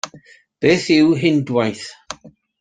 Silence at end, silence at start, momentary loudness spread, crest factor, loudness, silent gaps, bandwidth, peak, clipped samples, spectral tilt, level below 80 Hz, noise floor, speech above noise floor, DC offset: 0.3 s; 0.05 s; 21 LU; 16 dB; -16 LUFS; none; 9.4 kHz; -2 dBFS; under 0.1%; -5.5 dB/octave; -58 dBFS; -47 dBFS; 31 dB; under 0.1%